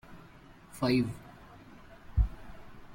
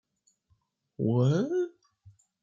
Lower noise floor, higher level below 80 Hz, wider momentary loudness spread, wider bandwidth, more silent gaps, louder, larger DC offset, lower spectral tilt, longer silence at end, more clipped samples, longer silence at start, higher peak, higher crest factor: second, -54 dBFS vs -72 dBFS; first, -40 dBFS vs -72 dBFS; first, 25 LU vs 8 LU; first, 16.5 kHz vs 7.4 kHz; neither; second, -32 LUFS vs -28 LUFS; neither; second, -7 dB/octave vs -8.5 dB/octave; second, 0 s vs 0.35 s; neither; second, 0.1 s vs 1 s; about the same, -14 dBFS vs -14 dBFS; about the same, 20 dB vs 16 dB